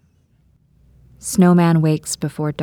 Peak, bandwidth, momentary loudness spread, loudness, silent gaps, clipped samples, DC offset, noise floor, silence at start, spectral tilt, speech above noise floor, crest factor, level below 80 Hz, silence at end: -2 dBFS; 16 kHz; 11 LU; -16 LUFS; none; under 0.1%; under 0.1%; -57 dBFS; 1.25 s; -6.5 dB/octave; 41 dB; 16 dB; -52 dBFS; 0 s